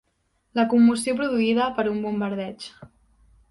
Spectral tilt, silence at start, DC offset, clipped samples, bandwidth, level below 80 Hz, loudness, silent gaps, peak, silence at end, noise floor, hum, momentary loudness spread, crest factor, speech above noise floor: -5 dB/octave; 0.55 s; under 0.1%; under 0.1%; 11.5 kHz; -60 dBFS; -22 LUFS; none; -8 dBFS; 0.65 s; -70 dBFS; none; 15 LU; 16 dB; 48 dB